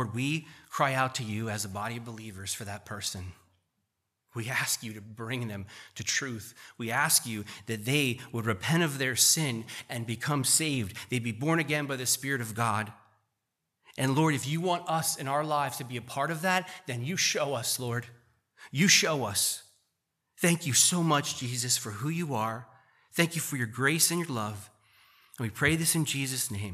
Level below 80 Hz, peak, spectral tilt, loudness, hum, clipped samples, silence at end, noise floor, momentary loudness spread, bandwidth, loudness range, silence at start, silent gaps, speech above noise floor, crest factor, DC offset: -66 dBFS; -8 dBFS; -3 dB/octave; -28 LUFS; none; under 0.1%; 0 s; -83 dBFS; 14 LU; 15 kHz; 7 LU; 0 s; none; 53 dB; 22 dB; under 0.1%